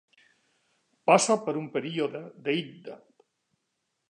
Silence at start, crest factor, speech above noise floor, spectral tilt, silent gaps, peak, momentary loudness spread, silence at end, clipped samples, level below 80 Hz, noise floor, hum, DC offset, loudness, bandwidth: 1.05 s; 24 dB; 53 dB; -4 dB/octave; none; -6 dBFS; 20 LU; 1.15 s; under 0.1%; -84 dBFS; -80 dBFS; none; under 0.1%; -27 LUFS; 11 kHz